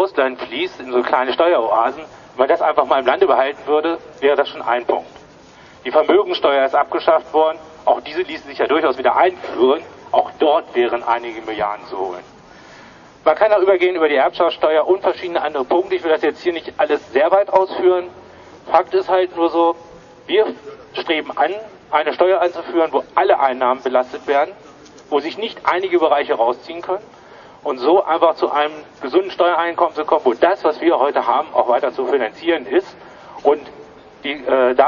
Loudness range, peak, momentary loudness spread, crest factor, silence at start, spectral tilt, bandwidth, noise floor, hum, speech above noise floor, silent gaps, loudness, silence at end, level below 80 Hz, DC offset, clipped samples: 3 LU; 0 dBFS; 10 LU; 18 dB; 0 s; -5 dB/octave; 7 kHz; -43 dBFS; none; 27 dB; none; -17 LUFS; 0 s; -58 dBFS; under 0.1%; under 0.1%